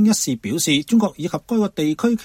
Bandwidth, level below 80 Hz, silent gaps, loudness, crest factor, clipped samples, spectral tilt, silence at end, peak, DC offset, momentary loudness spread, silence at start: 16.5 kHz; -56 dBFS; none; -20 LUFS; 14 dB; under 0.1%; -4 dB/octave; 0 s; -6 dBFS; under 0.1%; 6 LU; 0 s